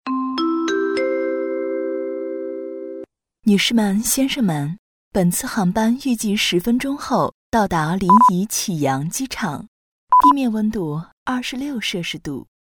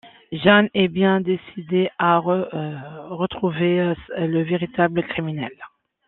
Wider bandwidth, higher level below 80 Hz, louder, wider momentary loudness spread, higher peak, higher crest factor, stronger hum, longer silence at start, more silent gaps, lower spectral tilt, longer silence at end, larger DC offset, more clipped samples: first, over 20 kHz vs 4.2 kHz; first, -48 dBFS vs -56 dBFS; about the same, -19 LUFS vs -21 LUFS; about the same, 13 LU vs 14 LU; about the same, -2 dBFS vs -2 dBFS; about the same, 18 dB vs 20 dB; neither; about the same, 0.05 s vs 0.05 s; first, 4.79-5.11 s, 7.34-7.52 s, 9.68-10.07 s, 11.12-11.26 s vs none; second, -4.5 dB/octave vs -10 dB/octave; second, 0.2 s vs 0.4 s; neither; neither